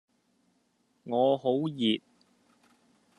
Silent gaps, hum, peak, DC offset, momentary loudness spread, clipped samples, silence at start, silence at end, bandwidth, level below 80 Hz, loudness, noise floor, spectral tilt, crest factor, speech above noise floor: none; none; -12 dBFS; under 0.1%; 7 LU; under 0.1%; 1.05 s; 1.2 s; 10.5 kHz; -78 dBFS; -28 LUFS; -72 dBFS; -7 dB/octave; 20 dB; 45 dB